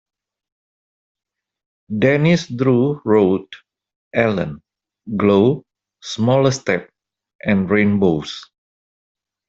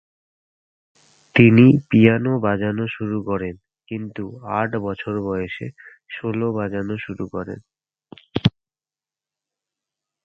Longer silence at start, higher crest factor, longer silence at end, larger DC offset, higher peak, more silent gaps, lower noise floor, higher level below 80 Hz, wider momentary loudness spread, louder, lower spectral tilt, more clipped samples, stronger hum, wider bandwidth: first, 1.9 s vs 1.35 s; about the same, 18 dB vs 22 dB; second, 1.05 s vs 1.75 s; neither; about the same, 0 dBFS vs 0 dBFS; first, 3.96-4.11 s, 7.35-7.39 s vs none; about the same, under -90 dBFS vs under -90 dBFS; about the same, -54 dBFS vs -50 dBFS; second, 13 LU vs 18 LU; first, -17 LUFS vs -20 LUFS; second, -6.5 dB/octave vs -9 dB/octave; neither; neither; first, 7.8 kHz vs 6.2 kHz